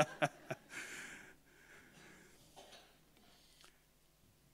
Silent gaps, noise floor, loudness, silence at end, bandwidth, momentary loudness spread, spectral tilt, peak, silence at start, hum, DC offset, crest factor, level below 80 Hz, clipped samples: none; -71 dBFS; -44 LUFS; 0.9 s; 16 kHz; 25 LU; -4 dB/octave; -14 dBFS; 0 s; none; under 0.1%; 34 dB; -76 dBFS; under 0.1%